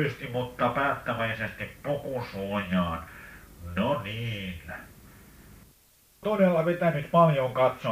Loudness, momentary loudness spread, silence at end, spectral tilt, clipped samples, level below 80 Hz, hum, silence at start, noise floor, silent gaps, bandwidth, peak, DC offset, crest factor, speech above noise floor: -28 LUFS; 16 LU; 0 s; -7 dB/octave; under 0.1%; -54 dBFS; none; 0 s; -61 dBFS; none; 15.5 kHz; -8 dBFS; under 0.1%; 20 dB; 33 dB